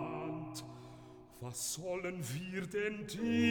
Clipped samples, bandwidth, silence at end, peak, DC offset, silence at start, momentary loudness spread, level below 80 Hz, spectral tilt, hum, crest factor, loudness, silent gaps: under 0.1%; 19 kHz; 0 s; -20 dBFS; under 0.1%; 0 s; 16 LU; -68 dBFS; -4.5 dB/octave; none; 18 dB; -39 LUFS; none